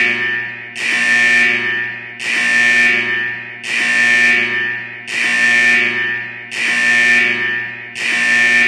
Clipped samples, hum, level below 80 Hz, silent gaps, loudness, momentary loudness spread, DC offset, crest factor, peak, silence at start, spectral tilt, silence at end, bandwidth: under 0.1%; none; -64 dBFS; none; -13 LUFS; 12 LU; under 0.1%; 14 dB; -2 dBFS; 0 s; -1 dB/octave; 0 s; 13 kHz